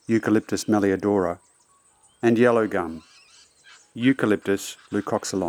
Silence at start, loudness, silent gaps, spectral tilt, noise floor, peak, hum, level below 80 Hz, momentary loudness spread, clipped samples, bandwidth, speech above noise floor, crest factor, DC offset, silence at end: 0.1 s; -23 LUFS; none; -5.5 dB/octave; -60 dBFS; -6 dBFS; none; -66 dBFS; 11 LU; under 0.1%; 17 kHz; 38 dB; 18 dB; under 0.1%; 0 s